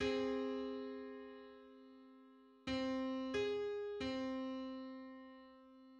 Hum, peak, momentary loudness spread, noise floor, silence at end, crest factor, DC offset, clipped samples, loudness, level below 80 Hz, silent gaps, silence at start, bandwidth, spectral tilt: none; -28 dBFS; 21 LU; -64 dBFS; 0 s; 16 dB; under 0.1%; under 0.1%; -43 LUFS; -68 dBFS; none; 0 s; 8.8 kHz; -5 dB/octave